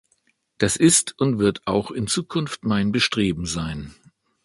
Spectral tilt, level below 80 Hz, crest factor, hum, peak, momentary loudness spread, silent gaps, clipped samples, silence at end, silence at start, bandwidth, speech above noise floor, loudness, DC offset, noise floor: -4 dB/octave; -46 dBFS; 20 dB; none; -4 dBFS; 11 LU; none; under 0.1%; 0.55 s; 0.6 s; 11.5 kHz; 45 dB; -21 LUFS; under 0.1%; -67 dBFS